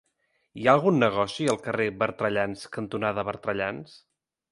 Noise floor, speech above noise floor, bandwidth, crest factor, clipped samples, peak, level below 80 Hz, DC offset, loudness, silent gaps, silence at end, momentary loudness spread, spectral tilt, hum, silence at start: -73 dBFS; 47 dB; 11.5 kHz; 24 dB; under 0.1%; -4 dBFS; -62 dBFS; under 0.1%; -26 LUFS; none; 0.55 s; 11 LU; -5.5 dB/octave; none; 0.55 s